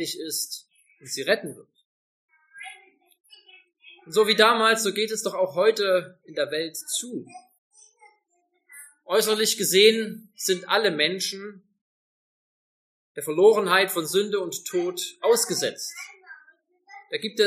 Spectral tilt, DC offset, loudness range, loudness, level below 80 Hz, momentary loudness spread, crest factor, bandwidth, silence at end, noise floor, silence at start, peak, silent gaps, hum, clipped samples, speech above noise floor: -2 dB/octave; under 0.1%; 9 LU; -23 LUFS; -82 dBFS; 20 LU; 22 dB; 15.5 kHz; 0 s; -72 dBFS; 0 s; -2 dBFS; 1.85-2.28 s, 7.58-7.71 s, 11.81-13.15 s; none; under 0.1%; 48 dB